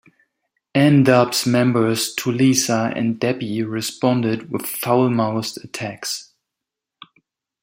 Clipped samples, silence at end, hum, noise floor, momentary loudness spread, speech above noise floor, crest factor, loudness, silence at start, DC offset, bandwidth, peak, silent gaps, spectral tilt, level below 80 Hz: under 0.1%; 1.4 s; none; -84 dBFS; 12 LU; 66 dB; 18 dB; -19 LUFS; 0.75 s; under 0.1%; 16.5 kHz; -2 dBFS; none; -5 dB/octave; -62 dBFS